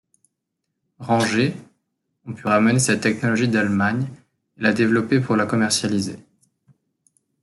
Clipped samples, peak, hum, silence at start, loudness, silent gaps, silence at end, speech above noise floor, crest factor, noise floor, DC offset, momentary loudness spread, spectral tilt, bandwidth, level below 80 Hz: under 0.1%; -4 dBFS; none; 1 s; -20 LUFS; none; 1.25 s; 59 dB; 18 dB; -79 dBFS; under 0.1%; 13 LU; -5 dB/octave; 12 kHz; -62 dBFS